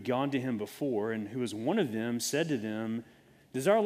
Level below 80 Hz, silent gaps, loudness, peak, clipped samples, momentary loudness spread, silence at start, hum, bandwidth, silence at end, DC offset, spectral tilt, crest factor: -76 dBFS; none; -33 LUFS; -12 dBFS; under 0.1%; 6 LU; 0 s; none; 15.5 kHz; 0 s; under 0.1%; -5 dB/octave; 20 dB